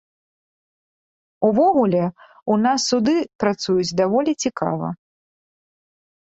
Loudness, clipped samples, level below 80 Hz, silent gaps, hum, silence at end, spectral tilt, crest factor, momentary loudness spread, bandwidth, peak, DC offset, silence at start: -20 LUFS; under 0.1%; -60 dBFS; 3.35-3.39 s; none; 1.45 s; -5 dB/octave; 18 dB; 11 LU; 8.2 kHz; -4 dBFS; under 0.1%; 1.4 s